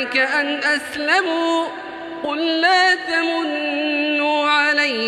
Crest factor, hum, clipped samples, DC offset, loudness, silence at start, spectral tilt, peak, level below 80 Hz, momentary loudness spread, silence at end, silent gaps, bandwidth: 16 dB; none; under 0.1%; under 0.1%; -18 LUFS; 0 s; -2 dB/octave; -2 dBFS; -66 dBFS; 9 LU; 0 s; none; 13.5 kHz